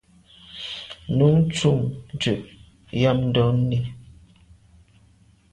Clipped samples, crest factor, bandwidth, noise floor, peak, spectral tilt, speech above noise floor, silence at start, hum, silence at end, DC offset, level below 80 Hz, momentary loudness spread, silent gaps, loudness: under 0.1%; 18 dB; 10.5 kHz; -56 dBFS; -6 dBFS; -6.5 dB/octave; 36 dB; 0.5 s; none; 1.5 s; under 0.1%; -48 dBFS; 15 LU; none; -22 LUFS